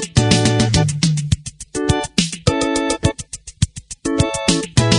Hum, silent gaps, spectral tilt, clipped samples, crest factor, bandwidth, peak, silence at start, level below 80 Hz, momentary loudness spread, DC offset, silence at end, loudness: none; none; -4.5 dB/octave; under 0.1%; 18 dB; 11 kHz; 0 dBFS; 0 s; -34 dBFS; 9 LU; under 0.1%; 0 s; -18 LUFS